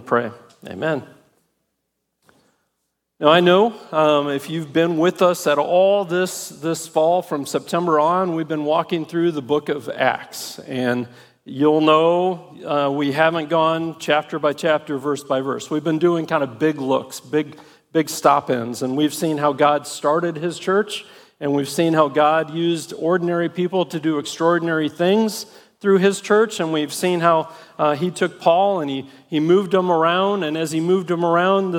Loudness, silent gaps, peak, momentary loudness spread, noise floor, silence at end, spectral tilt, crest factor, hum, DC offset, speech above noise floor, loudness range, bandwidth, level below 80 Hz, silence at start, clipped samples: -19 LUFS; none; -2 dBFS; 8 LU; -75 dBFS; 0 s; -5 dB/octave; 18 dB; none; under 0.1%; 56 dB; 3 LU; 17.5 kHz; -72 dBFS; 0 s; under 0.1%